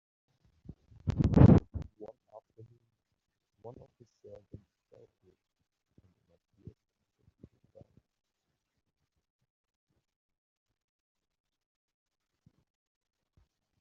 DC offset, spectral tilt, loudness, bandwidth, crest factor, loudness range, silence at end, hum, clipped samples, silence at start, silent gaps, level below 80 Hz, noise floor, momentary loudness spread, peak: under 0.1%; -10.5 dB/octave; -25 LUFS; 7 kHz; 30 dB; 27 LU; 10.1 s; none; under 0.1%; 1.05 s; none; -48 dBFS; -85 dBFS; 31 LU; -6 dBFS